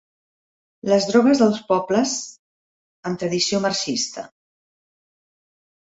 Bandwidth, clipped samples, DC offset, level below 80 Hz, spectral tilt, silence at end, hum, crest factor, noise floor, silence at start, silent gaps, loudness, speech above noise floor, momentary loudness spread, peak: 8 kHz; under 0.1%; under 0.1%; -64 dBFS; -4 dB/octave; 1.7 s; none; 20 dB; under -90 dBFS; 0.85 s; 2.39-3.03 s; -20 LUFS; over 70 dB; 17 LU; -4 dBFS